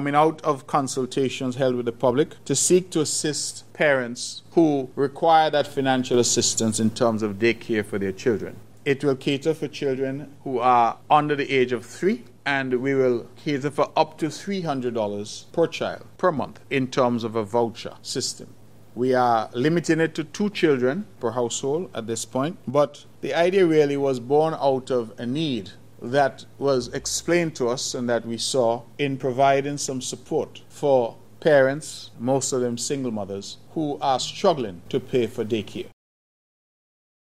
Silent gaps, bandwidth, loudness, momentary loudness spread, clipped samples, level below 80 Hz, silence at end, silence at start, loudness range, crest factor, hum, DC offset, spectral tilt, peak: none; 15.5 kHz; -23 LUFS; 10 LU; under 0.1%; -62 dBFS; 1.35 s; 0 s; 4 LU; 18 dB; none; 0.4%; -4.5 dB/octave; -4 dBFS